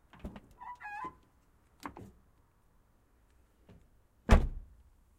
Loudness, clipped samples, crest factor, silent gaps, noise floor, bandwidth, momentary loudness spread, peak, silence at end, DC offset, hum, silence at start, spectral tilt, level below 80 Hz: -35 LUFS; under 0.1%; 28 dB; none; -67 dBFS; 13 kHz; 23 LU; -8 dBFS; 0.55 s; under 0.1%; none; 0.25 s; -6.5 dB/octave; -38 dBFS